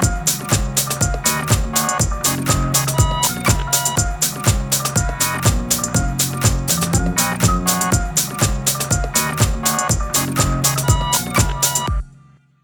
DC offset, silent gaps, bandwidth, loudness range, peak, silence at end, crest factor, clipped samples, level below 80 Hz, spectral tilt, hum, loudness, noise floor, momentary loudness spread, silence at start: under 0.1%; none; over 20 kHz; 0 LU; -4 dBFS; 0.5 s; 14 dB; under 0.1%; -26 dBFS; -3 dB/octave; none; -17 LUFS; -48 dBFS; 3 LU; 0 s